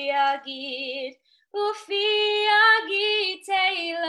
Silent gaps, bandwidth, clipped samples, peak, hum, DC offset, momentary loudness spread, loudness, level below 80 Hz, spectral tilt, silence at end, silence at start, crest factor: none; 12 kHz; under 0.1%; -8 dBFS; none; under 0.1%; 14 LU; -22 LUFS; -84 dBFS; 0 dB/octave; 0 s; 0 s; 16 dB